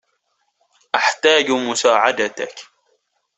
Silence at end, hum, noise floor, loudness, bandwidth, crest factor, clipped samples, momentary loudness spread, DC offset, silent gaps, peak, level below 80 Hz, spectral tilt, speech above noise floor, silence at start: 0.75 s; none; -69 dBFS; -16 LUFS; 8.4 kHz; 18 dB; under 0.1%; 15 LU; under 0.1%; none; -2 dBFS; -66 dBFS; -1.5 dB/octave; 52 dB; 0.95 s